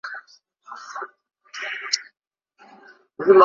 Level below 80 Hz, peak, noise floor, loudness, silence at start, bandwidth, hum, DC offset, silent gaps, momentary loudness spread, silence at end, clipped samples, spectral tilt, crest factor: -72 dBFS; -2 dBFS; -55 dBFS; -25 LUFS; 0.05 s; 7.4 kHz; none; under 0.1%; none; 20 LU; 0 s; under 0.1%; -3 dB/octave; 22 dB